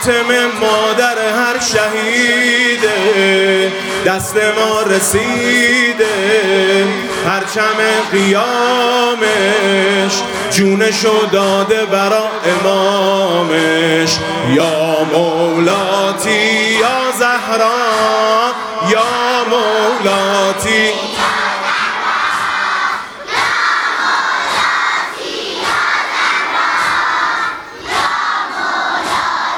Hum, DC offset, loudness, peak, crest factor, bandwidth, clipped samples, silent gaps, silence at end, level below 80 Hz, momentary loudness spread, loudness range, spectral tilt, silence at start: none; under 0.1%; -13 LUFS; 0 dBFS; 14 dB; 18 kHz; under 0.1%; none; 0 s; -52 dBFS; 4 LU; 2 LU; -3 dB/octave; 0 s